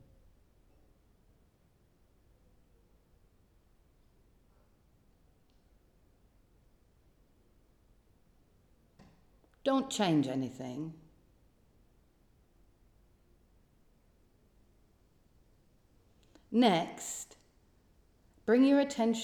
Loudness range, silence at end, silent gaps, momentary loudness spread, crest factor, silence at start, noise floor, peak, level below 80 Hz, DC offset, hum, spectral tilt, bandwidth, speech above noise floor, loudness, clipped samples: 12 LU; 0 s; none; 16 LU; 24 dB; 9.65 s; -68 dBFS; -14 dBFS; -68 dBFS; under 0.1%; none; -5 dB/octave; 15.5 kHz; 39 dB; -31 LUFS; under 0.1%